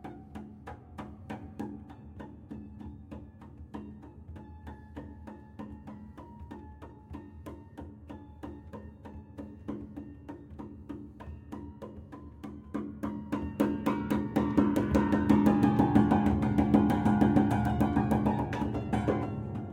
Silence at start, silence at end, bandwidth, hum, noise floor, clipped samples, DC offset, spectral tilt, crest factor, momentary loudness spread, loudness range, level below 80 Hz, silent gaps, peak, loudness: 0 s; 0 s; 16.5 kHz; none; -49 dBFS; under 0.1%; under 0.1%; -8.5 dB/octave; 22 dB; 23 LU; 21 LU; -50 dBFS; none; -10 dBFS; -28 LUFS